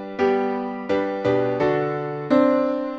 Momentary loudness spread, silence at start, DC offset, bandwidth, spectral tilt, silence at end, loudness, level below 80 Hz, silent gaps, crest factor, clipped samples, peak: 7 LU; 0 s; under 0.1%; 7.2 kHz; -8 dB/octave; 0 s; -22 LUFS; -58 dBFS; none; 16 dB; under 0.1%; -4 dBFS